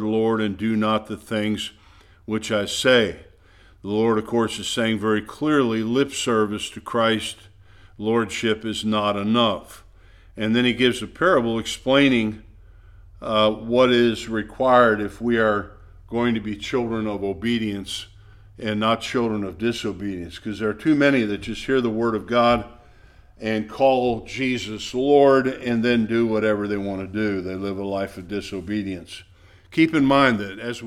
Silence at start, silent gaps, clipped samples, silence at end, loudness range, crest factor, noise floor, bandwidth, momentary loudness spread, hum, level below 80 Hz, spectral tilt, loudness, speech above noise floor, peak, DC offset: 0 s; none; under 0.1%; 0 s; 5 LU; 20 dB; -51 dBFS; 14 kHz; 12 LU; none; -50 dBFS; -5 dB/octave; -22 LUFS; 30 dB; -2 dBFS; under 0.1%